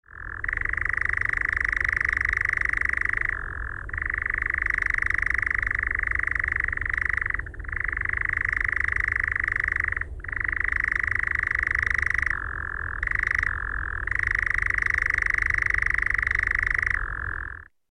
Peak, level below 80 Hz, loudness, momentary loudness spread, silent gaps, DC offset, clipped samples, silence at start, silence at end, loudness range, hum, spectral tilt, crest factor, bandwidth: -12 dBFS; -36 dBFS; -24 LUFS; 8 LU; none; under 0.1%; under 0.1%; 0.15 s; 0.25 s; 2 LU; none; -4.5 dB/octave; 14 dB; 11 kHz